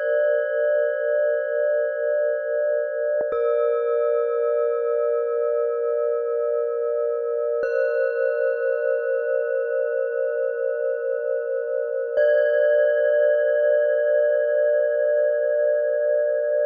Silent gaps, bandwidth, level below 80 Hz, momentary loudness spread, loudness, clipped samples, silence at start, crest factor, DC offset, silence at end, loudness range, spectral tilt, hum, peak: none; 4.4 kHz; -76 dBFS; 5 LU; -22 LUFS; under 0.1%; 0 s; 12 dB; under 0.1%; 0 s; 4 LU; -4 dB/octave; none; -10 dBFS